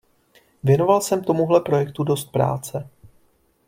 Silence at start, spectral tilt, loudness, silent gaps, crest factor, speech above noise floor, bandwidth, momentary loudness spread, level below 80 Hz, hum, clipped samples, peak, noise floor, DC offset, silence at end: 0.65 s; -6.5 dB/octave; -20 LUFS; none; 18 dB; 42 dB; 16.5 kHz; 10 LU; -56 dBFS; none; under 0.1%; -4 dBFS; -61 dBFS; under 0.1%; 0.85 s